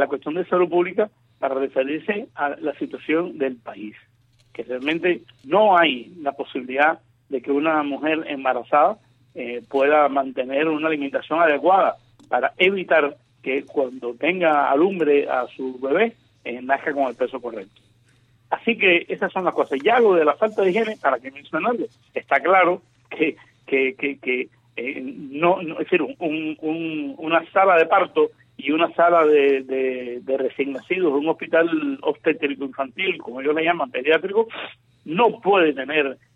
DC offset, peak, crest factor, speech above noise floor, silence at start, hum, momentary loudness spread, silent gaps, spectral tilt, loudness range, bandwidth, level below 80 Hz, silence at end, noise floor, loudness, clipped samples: under 0.1%; -4 dBFS; 16 dB; 37 dB; 0 s; none; 13 LU; none; -6.5 dB/octave; 5 LU; 7 kHz; -72 dBFS; 0.2 s; -58 dBFS; -21 LUFS; under 0.1%